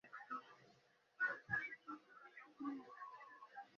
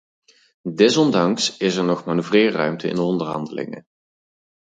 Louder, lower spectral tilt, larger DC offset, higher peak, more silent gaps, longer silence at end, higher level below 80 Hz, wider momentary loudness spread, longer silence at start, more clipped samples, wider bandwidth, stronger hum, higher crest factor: second, -48 LUFS vs -19 LUFS; second, -3 dB/octave vs -5 dB/octave; neither; second, -28 dBFS vs -2 dBFS; neither; second, 0 s vs 0.9 s; second, -86 dBFS vs -66 dBFS; about the same, 17 LU vs 15 LU; second, 0.05 s vs 0.65 s; neither; second, 7 kHz vs 9.4 kHz; neither; about the same, 22 dB vs 20 dB